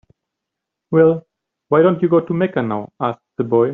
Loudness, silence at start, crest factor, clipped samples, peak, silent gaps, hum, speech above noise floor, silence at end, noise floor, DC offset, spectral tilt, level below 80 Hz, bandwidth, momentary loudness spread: -17 LUFS; 0.9 s; 16 dB; under 0.1%; -2 dBFS; none; none; 66 dB; 0 s; -81 dBFS; under 0.1%; -7.5 dB/octave; -60 dBFS; 3.9 kHz; 10 LU